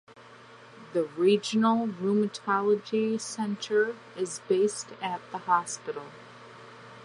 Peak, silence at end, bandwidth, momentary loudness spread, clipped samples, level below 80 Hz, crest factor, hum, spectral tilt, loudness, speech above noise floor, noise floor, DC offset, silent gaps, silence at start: -10 dBFS; 0 s; 11 kHz; 22 LU; under 0.1%; -80 dBFS; 18 dB; none; -4.5 dB/octave; -28 LUFS; 23 dB; -51 dBFS; under 0.1%; none; 0.1 s